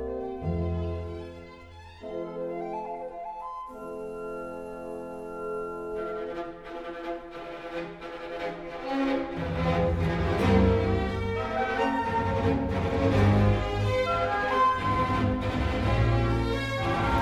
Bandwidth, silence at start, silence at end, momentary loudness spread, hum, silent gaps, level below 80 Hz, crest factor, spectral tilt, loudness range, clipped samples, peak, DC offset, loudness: 11.5 kHz; 0 s; 0 s; 15 LU; none; none; -38 dBFS; 16 dB; -7.5 dB/octave; 11 LU; under 0.1%; -12 dBFS; under 0.1%; -28 LUFS